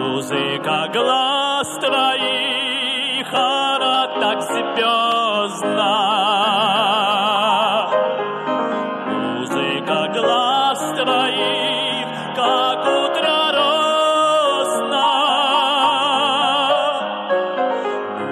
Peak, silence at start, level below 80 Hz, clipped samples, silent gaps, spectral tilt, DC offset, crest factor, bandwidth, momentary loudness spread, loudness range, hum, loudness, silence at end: -6 dBFS; 0 s; -72 dBFS; under 0.1%; none; -3 dB/octave; under 0.1%; 12 dB; 14.5 kHz; 5 LU; 3 LU; none; -17 LUFS; 0 s